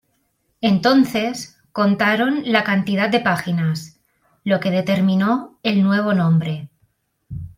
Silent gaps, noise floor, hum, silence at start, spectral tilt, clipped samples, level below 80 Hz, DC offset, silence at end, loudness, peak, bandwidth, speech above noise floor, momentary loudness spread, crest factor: none; -67 dBFS; none; 0.6 s; -6.5 dB/octave; under 0.1%; -56 dBFS; under 0.1%; 0.1 s; -18 LUFS; -2 dBFS; 16 kHz; 49 dB; 12 LU; 16 dB